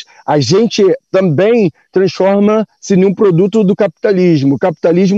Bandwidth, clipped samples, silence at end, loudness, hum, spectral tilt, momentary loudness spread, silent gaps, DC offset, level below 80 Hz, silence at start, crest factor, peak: 7.8 kHz; under 0.1%; 0 s; -11 LUFS; none; -7 dB/octave; 4 LU; none; under 0.1%; -58 dBFS; 0.3 s; 10 dB; -2 dBFS